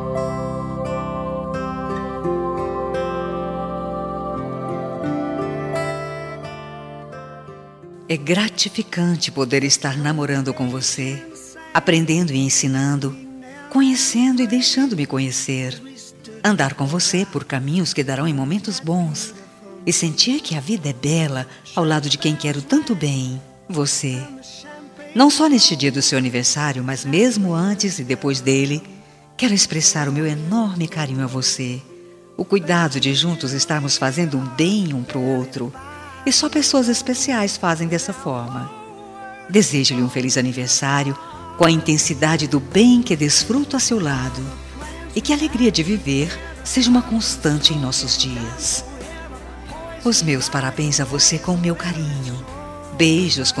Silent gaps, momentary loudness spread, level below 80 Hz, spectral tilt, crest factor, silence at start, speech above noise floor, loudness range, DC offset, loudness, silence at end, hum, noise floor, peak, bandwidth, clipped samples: none; 17 LU; -44 dBFS; -4 dB/octave; 20 dB; 0 s; 21 dB; 8 LU; under 0.1%; -19 LUFS; 0 s; none; -40 dBFS; 0 dBFS; 13 kHz; under 0.1%